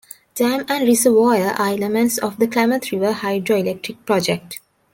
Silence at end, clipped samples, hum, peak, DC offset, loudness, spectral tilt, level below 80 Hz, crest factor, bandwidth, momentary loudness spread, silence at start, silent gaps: 0.35 s; under 0.1%; none; -2 dBFS; under 0.1%; -18 LUFS; -4 dB/octave; -62 dBFS; 16 dB; 17 kHz; 11 LU; 0.35 s; none